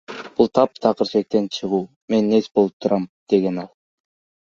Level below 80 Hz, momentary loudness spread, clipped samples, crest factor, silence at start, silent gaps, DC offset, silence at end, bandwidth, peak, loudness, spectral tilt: -62 dBFS; 7 LU; under 0.1%; 18 dB; 0.1 s; 1.96-2.08 s, 2.73-2.80 s, 3.09-3.27 s; under 0.1%; 0.8 s; 7.4 kHz; -2 dBFS; -20 LUFS; -7 dB/octave